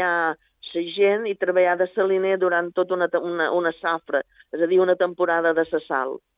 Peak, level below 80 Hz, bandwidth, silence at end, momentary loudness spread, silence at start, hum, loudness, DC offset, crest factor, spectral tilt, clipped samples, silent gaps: -8 dBFS; -70 dBFS; 5 kHz; 0.2 s; 7 LU; 0 s; none; -22 LUFS; under 0.1%; 14 dB; -8.5 dB/octave; under 0.1%; none